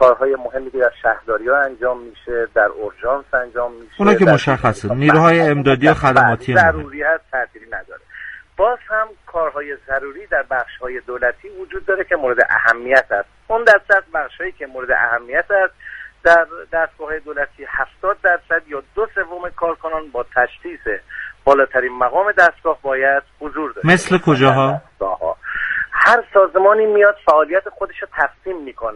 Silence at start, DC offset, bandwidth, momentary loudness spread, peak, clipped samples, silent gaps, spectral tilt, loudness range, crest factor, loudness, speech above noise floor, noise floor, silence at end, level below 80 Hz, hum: 0 s; under 0.1%; 11.5 kHz; 14 LU; 0 dBFS; under 0.1%; none; -6 dB/octave; 7 LU; 16 dB; -16 LUFS; 19 dB; -35 dBFS; 0 s; -44 dBFS; none